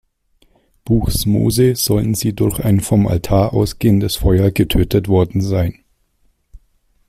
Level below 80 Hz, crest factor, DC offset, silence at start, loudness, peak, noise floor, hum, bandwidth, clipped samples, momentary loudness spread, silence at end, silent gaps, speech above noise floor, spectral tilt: -30 dBFS; 14 dB; under 0.1%; 0.85 s; -16 LUFS; -2 dBFS; -60 dBFS; none; 16 kHz; under 0.1%; 4 LU; 0.5 s; none; 45 dB; -6 dB/octave